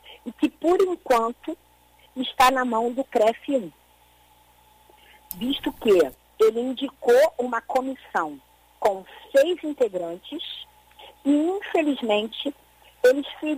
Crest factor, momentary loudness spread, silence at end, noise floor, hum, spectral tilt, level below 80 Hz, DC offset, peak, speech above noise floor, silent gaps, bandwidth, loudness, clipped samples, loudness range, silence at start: 18 dB; 14 LU; 0 s; -57 dBFS; 60 Hz at -60 dBFS; -4 dB/octave; -58 dBFS; under 0.1%; -6 dBFS; 35 dB; none; 15.5 kHz; -23 LUFS; under 0.1%; 4 LU; 0.1 s